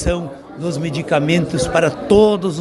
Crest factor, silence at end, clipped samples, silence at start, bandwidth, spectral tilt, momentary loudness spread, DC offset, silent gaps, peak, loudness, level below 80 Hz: 16 dB; 0 s; under 0.1%; 0 s; 11.5 kHz; -6 dB/octave; 12 LU; under 0.1%; none; 0 dBFS; -17 LUFS; -34 dBFS